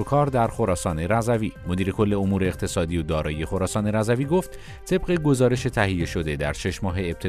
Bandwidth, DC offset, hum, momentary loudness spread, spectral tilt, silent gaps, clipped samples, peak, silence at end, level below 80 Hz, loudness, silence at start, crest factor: 14 kHz; under 0.1%; none; 6 LU; -6 dB/octave; none; under 0.1%; -6 dBFS; 0 s; -38 dBFS; -24 LUFS; 0 s; 16 dB